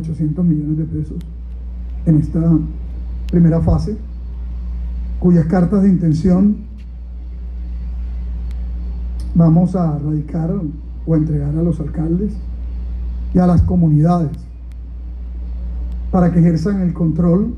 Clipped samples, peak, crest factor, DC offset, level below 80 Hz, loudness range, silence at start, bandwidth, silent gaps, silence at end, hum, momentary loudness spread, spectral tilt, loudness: under 0.1%; -4 dBFS; 12 dB; under 0.1%; -24 dBFS; 3 LU; 0 s; 6 kHz; none; 0 s; none; 17 LU; -10.5 dB/octave; -17 LUFS